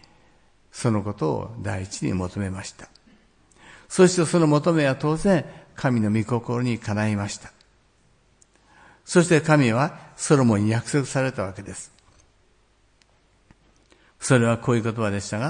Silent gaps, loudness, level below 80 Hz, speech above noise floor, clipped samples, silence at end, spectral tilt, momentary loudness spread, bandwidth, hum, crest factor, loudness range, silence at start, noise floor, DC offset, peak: none; -22 LUFS; -54 dBFS; 39 dB; under 0.1%; 0 s; -6 dB/octave; 14 LU; 10.5 kHz; none; 20 dB; 7 LU; 0.75 s; -61 dBFS; under 0.1%; -4 dBFS